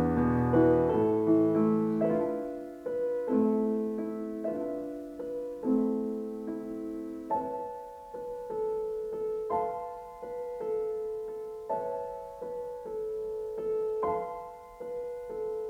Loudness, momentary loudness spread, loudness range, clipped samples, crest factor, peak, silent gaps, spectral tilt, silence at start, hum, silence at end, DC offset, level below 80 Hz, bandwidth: -32 LUFS; 14 LU; 8 LU; under 0.1%; 18 dB; -14 dBFS; none; -9.5 dB/octave; 0 s; none; 0 s; under 0.1%; -58 dBFS; 14.5 kHz